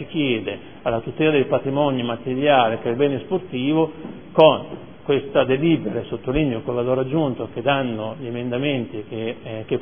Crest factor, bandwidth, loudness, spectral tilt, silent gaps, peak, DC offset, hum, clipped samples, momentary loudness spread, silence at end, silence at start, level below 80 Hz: 20 dB; 3.7 kHz; -21 LUFS; -10 dB/octave; none; 0 dBFS; 0.5%; none; under 0.1%; 12 LU; 0 s; 0 s; -48 dBFS